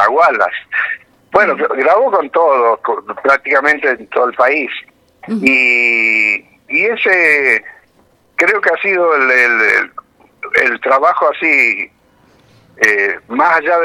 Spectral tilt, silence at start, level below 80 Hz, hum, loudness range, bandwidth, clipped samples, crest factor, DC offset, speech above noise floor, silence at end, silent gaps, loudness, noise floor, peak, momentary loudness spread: -3.5 dB/octave; 0 s; -58 dBFS; none; 2 LU; 15.5 kHz; under 0.1%; 14 dB; under 0.1%; 40 dB; 0 s; none; -12 LUFS; -53 dBFS; 0 dBFS; 9 LU